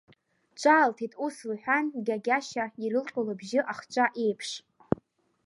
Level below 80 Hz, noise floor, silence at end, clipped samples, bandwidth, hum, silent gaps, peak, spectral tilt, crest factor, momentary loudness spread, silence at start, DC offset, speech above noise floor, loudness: -66 dBFS; -63 dBFS; 0.85 s; under 0.1%; 11.5 kHz; none; none; -8 dBFS; -4.5 dB/octave; 22 dB; 11 LU; 0.55 s; under 0.1%; 35 dB; -28 LUFS